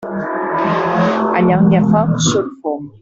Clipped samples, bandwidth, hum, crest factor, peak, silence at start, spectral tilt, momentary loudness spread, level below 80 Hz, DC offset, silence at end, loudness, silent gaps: under 0.1%; 7.8 kHz; none; 12 dB; -2 dBFS; 0 s; -6 dB/octave; 10 LU; -48 dBFS; under 0.1%; 0.15 s; -15 LUFS; none